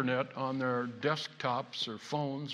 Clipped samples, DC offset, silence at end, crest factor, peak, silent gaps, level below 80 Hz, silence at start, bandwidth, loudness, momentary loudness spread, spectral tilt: under 0.1%; under 0.1%; 0 s; 18 dB; -16 dBFS; none; -82 dBFS; 0 s; 11.5 kHz; -35 LUFS; 3 LU; -5.5 dB/octave